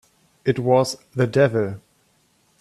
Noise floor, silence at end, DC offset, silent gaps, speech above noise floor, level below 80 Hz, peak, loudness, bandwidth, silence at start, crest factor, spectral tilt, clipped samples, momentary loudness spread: -62 dBFS; 0.85 s; under 0.1%; none; 43 dB; -60 dBFS; -4 dBFS; -21 LUFS; 13 kHz; 0.45 s; 18 dB; -6.5 dB/octave; under 0.1%; 10 LU